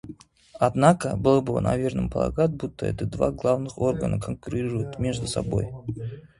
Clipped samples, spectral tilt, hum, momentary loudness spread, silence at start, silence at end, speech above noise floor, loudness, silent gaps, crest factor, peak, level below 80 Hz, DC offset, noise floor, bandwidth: under 0.1%; -7 dB/octave; none; 10 LU; 0.05 s; 0.15 s; 22 dB; -25 LUFS; none; 24 dB; -2 dBFS; -44 dBFS; under 0.1%; -46 dBFS; 11.5 kHz